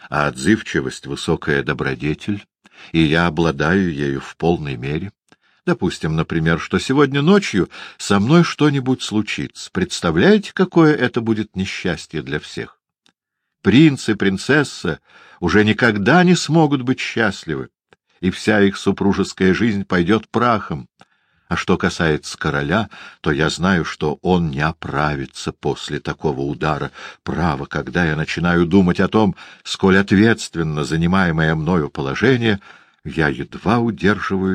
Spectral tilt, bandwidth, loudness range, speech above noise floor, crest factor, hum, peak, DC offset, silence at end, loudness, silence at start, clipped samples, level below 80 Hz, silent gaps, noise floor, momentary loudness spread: -6 dB/octave; 10 kHz; 4 LU; 61 dB; 18 dB; none; 0 dBFS; under 0.1%; 0 s; -18 LUFS; 0.05 s; under 0.1%; -42 dBFS; none; -78 dBFS; 12 LU